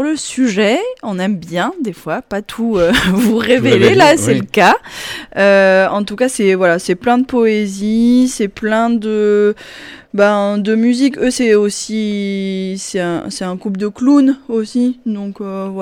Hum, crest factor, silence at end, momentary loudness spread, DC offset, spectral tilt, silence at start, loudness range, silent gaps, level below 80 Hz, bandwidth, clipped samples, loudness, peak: none; 12 dB; 0 s; 12 LU; under 0.1%; -5 dB/octave; 0 s; 5 LU; none; -44 dBFS; 18.5 kHz; under 0.1%; -14 LUFS; -2 dBFS